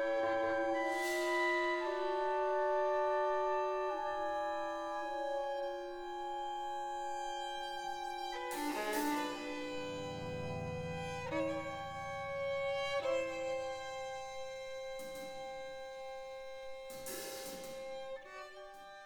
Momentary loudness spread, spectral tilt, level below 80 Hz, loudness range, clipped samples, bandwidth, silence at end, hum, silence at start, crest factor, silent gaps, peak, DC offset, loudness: 12 LU; -4 dB/octave; -66 dBFS; 11 LU; under 0.1%; 19 kHz; 0 s; none; 0 s; 16 dB; none; -22 dBFS; under 0.1%; -39 LUFS